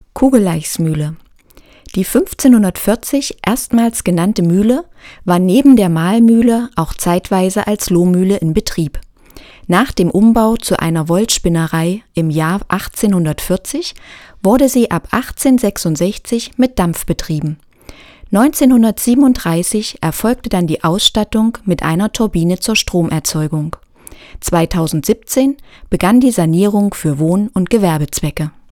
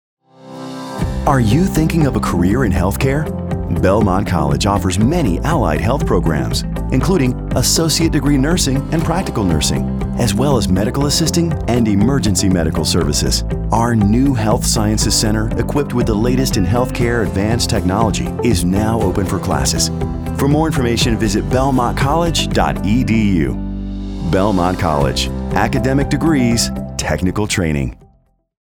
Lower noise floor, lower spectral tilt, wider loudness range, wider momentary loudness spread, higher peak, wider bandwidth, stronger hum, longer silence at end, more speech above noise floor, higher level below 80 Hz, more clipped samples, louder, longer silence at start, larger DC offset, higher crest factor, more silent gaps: second, -44 dBFS vs -55 dBFS; about the same, -5.5 dB/octave vs -5 dB/octave; first, 4 LU vs 1 LU; first, 9 LU vs 5 LU; about the same, 0 dBFS vs 0 dBFS; second, 18 kHz vs over 20 kHz; neither; second, 0.2 s vs 0.7 s; second, 31 dB vs 40 dB; second, -34 dBFS vs -26 dBFS; first, 0.1% vs under 0.1%; about the same, -14 LUFS vs -16 LUFS; second, 0.15 s vs 0.45 s; neither; about the same, 14 dB vs 16 dB; neither